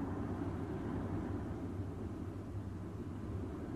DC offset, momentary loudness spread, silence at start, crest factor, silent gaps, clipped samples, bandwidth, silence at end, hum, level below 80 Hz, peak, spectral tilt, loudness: under 0.1%; 4 LU; 0 s; 12 dB; none; under 0.1%; 12.5 kHz; 0 s; none; -54 dBFS; -28 dBFS; -9 dB/octave; -43 LUFS